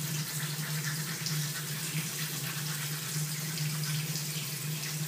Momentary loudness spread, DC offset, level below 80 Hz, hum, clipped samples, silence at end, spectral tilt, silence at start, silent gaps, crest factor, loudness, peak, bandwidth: 2 LU; under 0.1%; -74 dBFS; none; under 0.1%; 0 s; -3 dB/octave; 0 s; none; 18 dB; -33 LUFS; -16 dBFS; 15.5 kHz